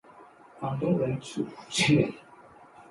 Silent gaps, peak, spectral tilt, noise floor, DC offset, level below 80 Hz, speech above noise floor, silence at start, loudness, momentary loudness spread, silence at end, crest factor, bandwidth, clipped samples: none; -10 dBFS; -5 dB/octave; -53 dBFS; under 0.1%; -60 dBFS; 25 dB; 0.2 s; -28 LUFS; 13 LU; 0.1 s; 20 dB; 11.5 kHz; under 0.1%